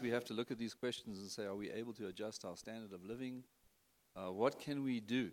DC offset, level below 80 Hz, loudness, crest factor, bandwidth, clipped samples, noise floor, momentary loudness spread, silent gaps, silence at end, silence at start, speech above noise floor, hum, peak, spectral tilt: under 0.1%; -80 dBFS; -44 LUFS; 22 dB; 17 kHz; under 0.1%; -75 dBFS; 11 LU; none; 0 s; 0 s; 32 dB; none; -22 dBFS; -5 dB/octave